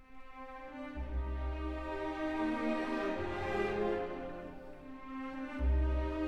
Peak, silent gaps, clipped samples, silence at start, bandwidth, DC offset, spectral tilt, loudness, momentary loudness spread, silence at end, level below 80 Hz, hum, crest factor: -22 dBFS; none; under 0.1%; 0 s; 7.8 kHz; under 0.1%; -8 dB/octave; -38 LUFS; 15 LU; 0 s; -40 dBFS; none; 14 dB